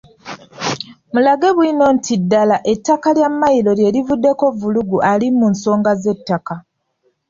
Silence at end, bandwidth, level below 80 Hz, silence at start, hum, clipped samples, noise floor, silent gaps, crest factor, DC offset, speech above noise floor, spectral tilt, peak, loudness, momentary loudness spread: 0.7 s; 7.6 kHz; -54 dBFS; 0.25 s; none; under 0.1%; -64 dBFS; none; 12 dB; under 0.1%; 50 dB; -6 dB/octave; -2 dBFS; -15 LUFS; 10 LU